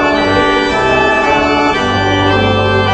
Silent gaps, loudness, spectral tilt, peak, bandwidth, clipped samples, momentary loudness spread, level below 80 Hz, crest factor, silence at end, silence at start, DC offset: none; -11 LUFS; -5.5 dB/octave; 0 dBFS; 8.6 kHz; under 0.1%; 2 LU; -30 dBFS; 10 dB; 0 s; 0 s; under 0.1%